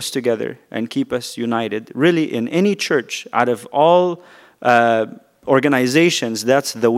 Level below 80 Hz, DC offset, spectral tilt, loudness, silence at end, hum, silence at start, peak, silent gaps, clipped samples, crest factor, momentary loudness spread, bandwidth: -66 dBFS; under 0.1%; -4.5 dB/octave; -18 LUFS; 0 s; none; 0 s; 0 dBFS; none; under 0.1%; 18 dB; 10 LU; 16 kHz